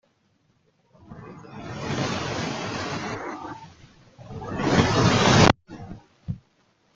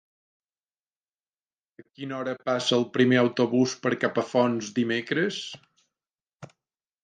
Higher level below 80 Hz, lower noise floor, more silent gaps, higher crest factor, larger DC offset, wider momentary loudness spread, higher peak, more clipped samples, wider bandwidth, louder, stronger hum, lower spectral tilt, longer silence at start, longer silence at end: first, -46 dBFS vs -76 dBFS; second, -66 dBFS vs under -90 dBFS; second, none vs 6.22-6.26 s, 6.35-6.40 s; first, 26 dB vs 20 dB; neither; first, 24 LU vs 14 LU; first, 0 dBFS vs -8 dBFS; neither; about the same, 9.2 kHz vs 9.4 kHz; about the same, -23 LUFS vs -25 LUFS; neither; about the same, -5 dB/octave vs -5 dB/octave; second, 1.1 s vs 2 s; about the same, 0.6 s vs 0.6 s